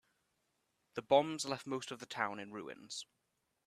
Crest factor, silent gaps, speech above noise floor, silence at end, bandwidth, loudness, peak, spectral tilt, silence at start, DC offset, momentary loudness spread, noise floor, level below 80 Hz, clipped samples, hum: 24 dB; none; 44 dB; 0.65 s; 13.5 kHz; -38 LUFS; -16 dBFS; -3.5 dB/octave; 0.95 s; under 0.1%; 16 LU; -82 dBFS; -82 dBFS; under 0.1%; none